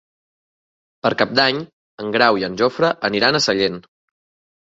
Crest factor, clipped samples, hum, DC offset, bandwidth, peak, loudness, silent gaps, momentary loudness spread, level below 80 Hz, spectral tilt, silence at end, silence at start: 20 dB; under 0.1%; none; under 0.1%; 8 kHz; -2 dBFS; -18 LUFS; 1.73-1.98 s; 12 LU; -58 dBFS; -4 dB/octave; 0.9 s; 1.05 s